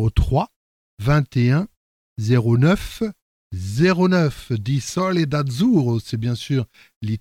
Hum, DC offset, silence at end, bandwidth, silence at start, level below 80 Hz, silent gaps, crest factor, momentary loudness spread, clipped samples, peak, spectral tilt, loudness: none; under 0.1%; 0 s; 15.5 kHz; 0 s; -34 dBFS; 0.56-0.97 s, 1.77-2.16 s, 3.22-3.50 s, 6.96-7.01 s; 16 dB; 13 LU; under 0.1%; -4 dBFS; -7 dB/octave; -20 LUFS